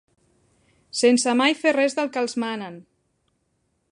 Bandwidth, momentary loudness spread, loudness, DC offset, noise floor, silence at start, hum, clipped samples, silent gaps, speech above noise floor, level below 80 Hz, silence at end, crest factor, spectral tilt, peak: 11 kHz; 13 LU; -21 LUFS; under 0.1%; -71 dBFS; 0.95 s; none; under 0.1%; none; 50 dB; -74 dBFS; 1.1 s; 18 dB; -2.5 dB/octave; -6 dBFS